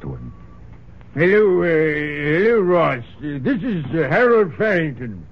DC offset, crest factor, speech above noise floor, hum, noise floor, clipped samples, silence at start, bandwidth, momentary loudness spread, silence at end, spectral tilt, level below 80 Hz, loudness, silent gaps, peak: 0.7%; 14 dB; 24 dB; none; -41 dBFS; under 0.1%; 0 s; 6.4 kHz; 16 LU; 0.05 s; -9 dB/octave; -46 dBFS; -18 LUFS; none; -4 dBFS